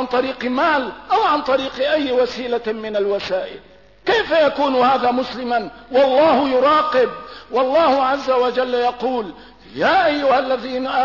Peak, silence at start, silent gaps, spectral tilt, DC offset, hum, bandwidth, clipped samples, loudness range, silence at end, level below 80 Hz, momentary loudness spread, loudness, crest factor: -6 dBFS; 0 s; none; -5 dB/octave; 0.2%; none; 6 kHz; under 0.1%; 3 LU; 0 s; -52 dBFS; 8 LU; -18 LUFS; 12 dB